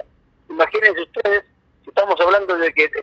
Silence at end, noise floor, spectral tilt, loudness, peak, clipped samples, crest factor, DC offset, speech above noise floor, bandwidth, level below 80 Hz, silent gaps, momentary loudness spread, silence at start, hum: 0 s; -45 dBFS; -4 dB/octave; -17 LUFS; 0 dBFS; under 0.1%; 18 dB; under 0.1%; 28 dB; 7.8 kHz; -58 dBFS; none; 7 LU; 0.5 s; none